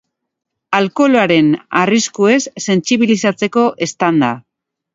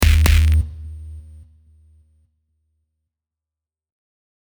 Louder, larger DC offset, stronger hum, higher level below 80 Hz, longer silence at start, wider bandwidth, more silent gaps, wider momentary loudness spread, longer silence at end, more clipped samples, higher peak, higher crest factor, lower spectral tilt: first, -14 LUFS vs -17 LUFS; neither; neither; second, -60 dBFS vs -22 dBFS; first, 0.7 s vs 0 s; second, 8 kHz vs over 20 kHz; neither; second, 5 LU vs 24 LU; second, 0.55 s vs 3.3 s; neither; about the same, 0 dBFS vs -2 dBFS; about the same, 14 dB vs 18 dB; about the same, -4.5 dB/octave vs -5 dB/octave